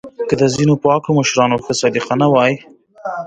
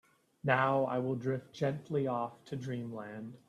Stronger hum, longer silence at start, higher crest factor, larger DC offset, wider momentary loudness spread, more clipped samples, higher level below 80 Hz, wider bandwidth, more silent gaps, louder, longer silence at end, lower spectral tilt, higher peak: neither; second, 0.05 s vs 0.45 s; second, 16 dB vs 22 dB; neither; second, 9 LU vs 13 LU; neither; first, -52 dBFS vs -74 dBFS; second, 9.4 kHz vs 11.5 kHz; neither; first, -15 LUFS vs -35 LUFS; about the same, 0 s vs 0.1 s; second, -5 dB/octave vs -7.5 dB/octave; first, 0 dBFS vs -14 dBFS